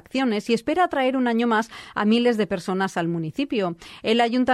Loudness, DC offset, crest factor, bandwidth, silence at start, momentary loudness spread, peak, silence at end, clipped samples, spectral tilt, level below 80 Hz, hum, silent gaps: -23 LUFS; under 0.1%; 14 dB; 12.5 kHz; 0.15 s; 7 LU; -8 dBFS; 0 s; under 0.1%; -5.5 dB/octave; -60 dBFS; none; none